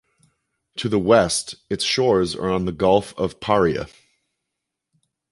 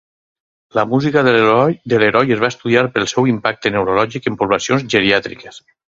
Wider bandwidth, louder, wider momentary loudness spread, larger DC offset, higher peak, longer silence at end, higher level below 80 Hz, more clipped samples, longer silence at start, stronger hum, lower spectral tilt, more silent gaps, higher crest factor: first, 11.5 kHz vs 7.8 kHz; second, -20 LUFS vs -15 LUFS; first, 12 LU vs 7 LU; neither; about the same, -2 dBFS vs 0 dBFS; first, 1.45 s vs 0.4 s; about the same, -48 dBFS vs -52 dBFS; neither; about the same, 0.75 s vs 0.75 s; neither; about the same, -4.5 dB/octave vs -5 dB/octave; neither; about the same, 20 dB vs 16 dB